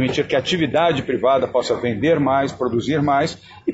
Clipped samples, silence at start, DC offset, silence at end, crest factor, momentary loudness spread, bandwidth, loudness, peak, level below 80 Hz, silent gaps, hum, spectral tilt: under 0.1%; 0 s; under 0.1%; 0 s; 14 dB; 4 LU; 8 kHz; -19 LUFS; -4 dBFS; -50 dBFS; none; none; -6 dB/octave